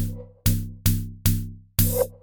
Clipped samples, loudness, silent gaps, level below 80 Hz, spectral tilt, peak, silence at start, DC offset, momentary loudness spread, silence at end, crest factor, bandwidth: under 0.1%; -25 LUFS; none; -32 dBFS; -5 dB/octave; -6 dBFS; 0 s; 0.2%; 6 LU; 0.05 s; 18 dB; 19.5 kHz